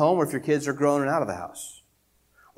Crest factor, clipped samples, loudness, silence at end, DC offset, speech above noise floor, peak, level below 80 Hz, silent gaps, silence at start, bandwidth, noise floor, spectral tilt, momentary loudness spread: 18 dB; under 0.1%; -25 LUFS; 0.8 s; under 0.1%; 42 dB; -8 dBFS; -66 dBFS; none; 0 s; 16.5 kHz; -66 dBFS; -6 dB/octave; 15 LU